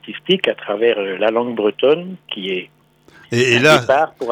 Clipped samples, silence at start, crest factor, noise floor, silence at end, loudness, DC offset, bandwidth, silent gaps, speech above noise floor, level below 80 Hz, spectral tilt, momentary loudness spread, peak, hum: under 0.1%; 0.05 s; 16 dB; -48 dBFS; 0 s; -16 LUFS; under 0.1%; 18.5 kHz; none; 32 dB; -60 dBFS; -4.5 dB/octave; 12 LU; -2 dBFS; none